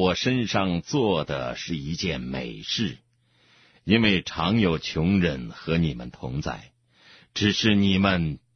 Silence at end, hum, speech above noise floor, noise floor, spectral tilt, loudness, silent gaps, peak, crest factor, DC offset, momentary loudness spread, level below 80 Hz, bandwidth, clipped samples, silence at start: 0.2 s; none; 38 dB; -62 dBFS; -5.5 dB/octave; -25 LUFS; none; -6 dBFS; 18 dB; under 0.1%; 12 LU; -46 dBFS; 6.6 kHz; under 0.1%; 0 s